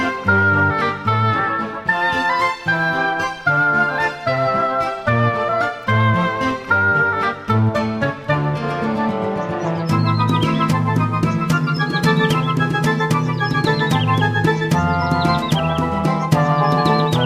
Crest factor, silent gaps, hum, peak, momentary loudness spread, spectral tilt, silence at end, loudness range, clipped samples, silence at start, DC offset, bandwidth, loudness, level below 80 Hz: 16 dB; none; none; -2 dBFS; 5 LU; -6.5 dB/octave; 0 s; 2 LU; under 0.1%; 0 s; under 0.1%; 15 kHz; -18 LUFS; -44 dBFS